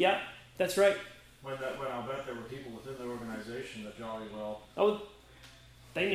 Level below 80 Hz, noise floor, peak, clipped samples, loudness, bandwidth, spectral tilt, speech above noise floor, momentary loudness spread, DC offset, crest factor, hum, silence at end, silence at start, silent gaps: -64 dBFS; -55 dBFS; -12 dBFS; under 0.1%; -35 LUFS; 16 kHz; -4 dB/octave; 22 dB; 20 LU; under 0.1%; 22 dB; none; 0 s; 0 s; none